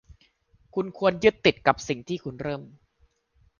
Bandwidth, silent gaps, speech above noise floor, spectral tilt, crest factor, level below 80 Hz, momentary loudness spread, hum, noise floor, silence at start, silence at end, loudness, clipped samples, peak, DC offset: 7.2 kHz; none; 41 dB; -5 dB/octave; 24 dB; -56 dBFS; 13 LU; none; -66 dBFS; 0.75 s; 0.9 s; -25 LUFS; under 0.1%; -4 dBFS; under 0.1%